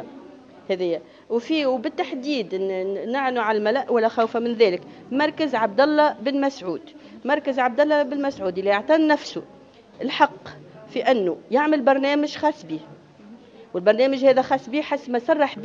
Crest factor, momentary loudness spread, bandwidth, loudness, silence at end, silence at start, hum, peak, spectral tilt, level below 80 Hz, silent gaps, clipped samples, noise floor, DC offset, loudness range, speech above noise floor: 20 dB; 13 LU; 7.6 kHz; -22 LUFS; 0 s; 0 s; none; -2 dBFS; -5.5 dB/octave; -70 dBFS; none; under 0.1%; -46 dBFS; under 0.1%; 2 LU; 24 dB